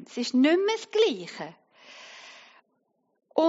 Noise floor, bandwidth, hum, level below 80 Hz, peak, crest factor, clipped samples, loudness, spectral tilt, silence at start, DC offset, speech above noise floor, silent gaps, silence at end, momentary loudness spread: -74 dBFS; 8 kHz; none; -88 dBFS; -10 dBFS; 18 dB; under 0.1%; -25 LUFS; -2 dB/octave; 0 s; under 0.1%; 48 dB; none; 0 s; 23 LU